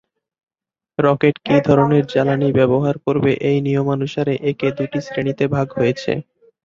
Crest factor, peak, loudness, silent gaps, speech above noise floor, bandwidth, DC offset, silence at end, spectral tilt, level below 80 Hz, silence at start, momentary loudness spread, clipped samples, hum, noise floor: 16 dB; -2 dBFS; -18 LUFS; none; 73 dB; 7.4 kHz; under 0.1%; 0.45 s; -8 dB/octave; -52 dBFS; 1 s; 8 LU; under 0.1%; none; -90 dBFS